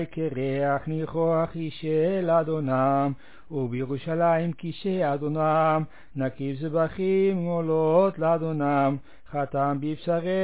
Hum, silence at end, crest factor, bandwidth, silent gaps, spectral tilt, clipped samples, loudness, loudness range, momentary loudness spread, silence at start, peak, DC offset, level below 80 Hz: none; 0 s; 16 dB; 4 kHz; none; -11.5 dB/octave; under 0.1%; -25 LUFS; 2 LU; 9 LU; 0 s; -10 dBFS; 0.7%; -60 dBFS